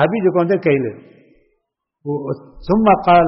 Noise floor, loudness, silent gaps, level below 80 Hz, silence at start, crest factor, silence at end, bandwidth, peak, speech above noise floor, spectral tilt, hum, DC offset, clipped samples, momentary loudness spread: -73 dBFS; -17 LUFS; none; -44 dBFS; 0 s; 14 dB; 0 s; 5.8 kHz; -2 dBFS; 57 dB; -6 dB/octave; none; under 0.1%; under 0.1%; 14 LU